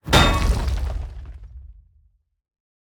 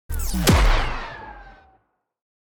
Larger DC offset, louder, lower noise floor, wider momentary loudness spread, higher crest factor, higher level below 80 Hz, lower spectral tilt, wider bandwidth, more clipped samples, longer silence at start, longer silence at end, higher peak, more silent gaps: neither; about the same, -21 LUFS vs -21 LUFS; about the same, -62 dBFS vs -65 dBFS; first, 25 LU vs 20 LU; first, 22 dB vs 16 dB; about the same, -26 dBFS vs -26 dBFS; about the same, -4.5 dB/octave vs -4.5 dB/octave; about the same, 19.5 kHz vs over 20 kHz; neither; about the same, 0.05 s vs 0.1 s; about the same, 1.1 s vs 1.1 s; first, 0 dBFS vs -8 dBFS; neither